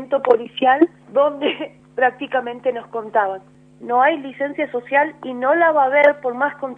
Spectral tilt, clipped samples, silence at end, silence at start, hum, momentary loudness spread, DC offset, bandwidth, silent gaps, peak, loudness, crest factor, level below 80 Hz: -6 dB/octave; under 0.1%; 0.05 s; 0 s; none; 10 LU; under 0.1%; 4.1 kHz; none; 0 dBFS; -18 LUFS; 18 dB; -68 dBFS